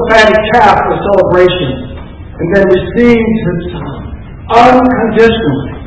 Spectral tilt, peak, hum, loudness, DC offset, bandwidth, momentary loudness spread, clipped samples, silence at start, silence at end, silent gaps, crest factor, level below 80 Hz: -6.5 dB/octave; 0 dBFS; none; -8 LUFS; 0.4%; 8 kHz; 18 LU; 4%; 0 s; 0 s; none; 8 dB; -28 dBFS